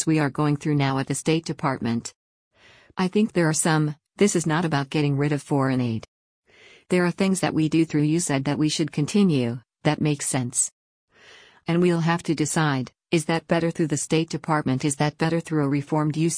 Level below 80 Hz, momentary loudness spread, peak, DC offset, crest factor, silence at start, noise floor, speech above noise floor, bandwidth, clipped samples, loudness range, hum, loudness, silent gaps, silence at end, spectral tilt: -60 dBFS; 6 LU; -8 dBFS; under 0.1%; 16 dB; 0 s; -51 dBFS; 29 dB; 10.5 kHz; under 0.1%; 2 LU; none; -23 LUFS; 2.15-2.51 s, 6.08-6.42 s, 10.72-11.08 s; 0 s; -5 dB/octave